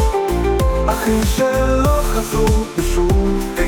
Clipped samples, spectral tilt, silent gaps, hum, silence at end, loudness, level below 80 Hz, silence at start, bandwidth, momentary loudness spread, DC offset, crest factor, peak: under 0.1%; -5.5 dB/octave; none; none; 0 s; -17 LUFS; -20 dBFS; 0 s; 19.5 kHz; 3 LU; under 0.1%; 12 dB; -4 dBFS